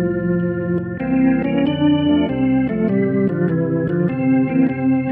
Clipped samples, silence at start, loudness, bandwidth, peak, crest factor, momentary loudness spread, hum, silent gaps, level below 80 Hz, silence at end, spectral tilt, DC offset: under 0.1%; 0 s; -18 LUFS; 3.6 kHz; -6 dBFS; 12 dB; 4 LU; none; none; -44 dBFS; 0 s; -11.5 dB/octave; under 0.1%